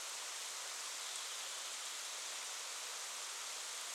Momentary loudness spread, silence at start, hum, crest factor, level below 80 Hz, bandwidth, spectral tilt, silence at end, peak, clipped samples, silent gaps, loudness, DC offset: 1 LU; 0 s; none; 18 dB; under -90 dBFS; 18 kHz; 4.5 dB/octave; 0 s; -28 dBFS; under 0.1%; none; -43 LUFS; under 0.1%